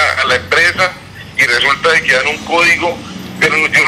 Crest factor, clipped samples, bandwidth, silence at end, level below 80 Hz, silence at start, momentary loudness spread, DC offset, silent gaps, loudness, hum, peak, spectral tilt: 12 dB; under 0.1%; 15 kHz; 0 s; -44 dBFS; 0 s; 11 LU; under 0.1%; none; -11 LUFS; none; 0 dBFS; -2.5 dB/octave